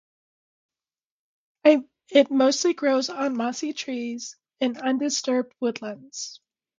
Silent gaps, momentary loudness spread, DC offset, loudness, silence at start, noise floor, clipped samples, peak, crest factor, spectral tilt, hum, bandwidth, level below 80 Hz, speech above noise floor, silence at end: none; 15 LU; under 0.1%; -24 LUFS; 1.65 s; under -90 dBFS; under 0.1%; -4 dBFS; 22 dB; -2.5 dB/octave; none; 9.4 kHz; -78 dBFS; over 66 dB; 0.4 s